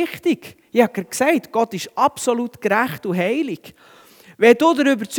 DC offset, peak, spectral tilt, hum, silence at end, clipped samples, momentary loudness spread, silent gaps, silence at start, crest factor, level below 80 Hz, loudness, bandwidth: under 0.1%; 0 dBFS; -4.5 dB/octave; none; 0 s; under 0.1%; 9 LU; none; 0 s; 20 dB; -66 dBFS; -19 LUFS; 20 kHz